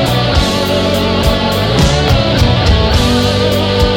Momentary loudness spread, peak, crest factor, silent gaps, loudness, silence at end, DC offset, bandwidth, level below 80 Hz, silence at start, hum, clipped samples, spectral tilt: 2 LU; -2 dBFS; 10 dB; none; -11 LUFS; 0 s; under 0.1%; 17 kHz; -18 dBFS; 0 s; none; under 0.1%; -5.5 dB/octave